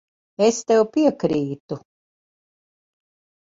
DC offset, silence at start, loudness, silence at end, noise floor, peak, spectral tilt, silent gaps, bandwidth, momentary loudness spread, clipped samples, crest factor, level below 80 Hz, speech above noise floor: under 0.1%; 0.4 s; -20 LUFS; 1.65 s; under -90 dBFS; -4 dBFS; -5.5 dB/octave; 1.60-1.68 s; 7.8 kHz; 17 LU; under 0.1%; 20 dB; -64 dBFS; over 70 dB